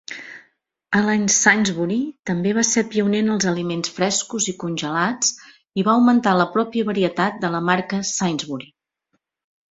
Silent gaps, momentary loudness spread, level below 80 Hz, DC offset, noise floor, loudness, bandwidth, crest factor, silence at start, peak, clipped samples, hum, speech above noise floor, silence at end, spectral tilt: 2.19-2.23 s; 10 LU; -60 dBFS; under 0.1%; -72 dBFS; -20 LUFS; 8 kHz; 20 dB; 0.1 s; 0 dBFS; under 0.1%; none; 53 dB; 1.05 s; -3.5 dB/octave